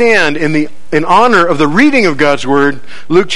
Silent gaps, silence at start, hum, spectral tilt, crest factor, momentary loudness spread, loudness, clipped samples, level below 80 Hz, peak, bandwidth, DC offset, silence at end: none; 0 s; none; -5 dB/octave; 12 dB; 8 LU; -10 LUFS; 0.9%; -44 dBFS; 0 dBFS; 11 kHz; 10%; 0 s